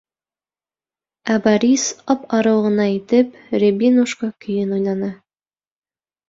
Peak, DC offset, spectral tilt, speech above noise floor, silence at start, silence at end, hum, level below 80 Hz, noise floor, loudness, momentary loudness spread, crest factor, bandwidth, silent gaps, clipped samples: -2 dBFS; under 0.1%; -5 dB/octave; over 73 dB; 1.25 s; 1.15 s; 50 Hz at -70 dBFS; -62 dBFS; under -90 dBFS; -18 LUFS; 8 LU; 18 dB; 7.8 kHz; none; under 0.1%